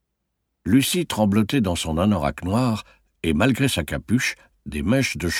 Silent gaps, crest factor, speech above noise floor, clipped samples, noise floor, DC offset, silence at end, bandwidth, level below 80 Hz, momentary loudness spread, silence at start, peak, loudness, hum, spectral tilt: none; 18 dB; 55 dB; under 0.1%; -77 dBFS; under 0.1%; 0 s; 17 kHz; -40 dBFS; 9 LU; 0.65 s; -4 dBFS; -22 LUFS; none; -5 dB/octave